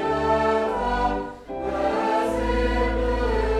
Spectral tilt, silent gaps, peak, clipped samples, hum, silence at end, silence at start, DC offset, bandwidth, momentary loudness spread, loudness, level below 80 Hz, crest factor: -6.5 dB/octave; none; -10 dBFS; under 0.1%; none; 0 s; 0 s; under 0.1%; 12 kHz; 7 LU; -24 LUFS; -30 dBFS; 12 dB